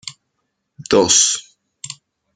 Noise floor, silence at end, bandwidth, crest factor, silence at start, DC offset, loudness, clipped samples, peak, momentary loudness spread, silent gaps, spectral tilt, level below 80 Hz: -73 dBFS; 0.45 s; 12.5 kHz; 20 dB; 0.05 s; under 0.1%; -14 LUFS; under 0.1%; 0 dBFS; 24 LU; none; -1.5 dB/octave; -56 dBFS